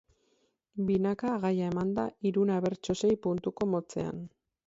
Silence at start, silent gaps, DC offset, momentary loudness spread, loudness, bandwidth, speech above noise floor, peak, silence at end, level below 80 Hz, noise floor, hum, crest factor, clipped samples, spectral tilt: 0.75 s; none; under 0.1%; 8 LU; -31 LUFS; 7.8 kHz; 43 dB; -16 dBFS; 0.4 s; -62 dBFS; -73 dBFS; none; 14 dB; under 0.1%; -7 dB/octave